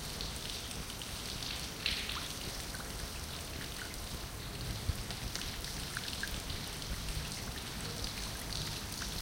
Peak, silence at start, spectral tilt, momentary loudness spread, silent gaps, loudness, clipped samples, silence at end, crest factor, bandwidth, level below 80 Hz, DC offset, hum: -16 dBFS; 0 s; -2.5 dB/octave; 4 LU; none; -39 LUFS; under 0.1%; 0 s; 24 dB; 17 kHz; -48 dBFS; under 0.1%; none